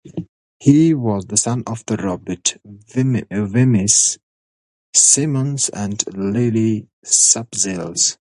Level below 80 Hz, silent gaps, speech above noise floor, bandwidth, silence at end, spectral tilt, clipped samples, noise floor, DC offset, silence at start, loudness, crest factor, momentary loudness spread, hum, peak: -50 dBFS; 0.29-0.60 s, 4.23-4.93 s, 6.93-7.02 s; over 73 dB; 11.5 kHz; 0.15 s; -4 dB/octave; under 0.1%; under -90 dBFS; under 0.1%; 0.05 s; -16 LUFS; 18 dB; 12 LU; none; 0 dBFS